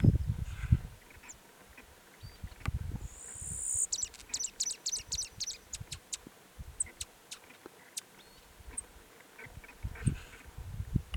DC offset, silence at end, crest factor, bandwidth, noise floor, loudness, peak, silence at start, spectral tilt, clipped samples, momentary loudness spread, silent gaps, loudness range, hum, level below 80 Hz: under 0.1%; 0 s; 26 dB; 19.5 kHz; -57 dBFS; -37 LUFS; -12 dBFS; 0 s; -3.5 dB/octave; under 0.1%; 22 LU; none; 8 LU; none; -46 dBFS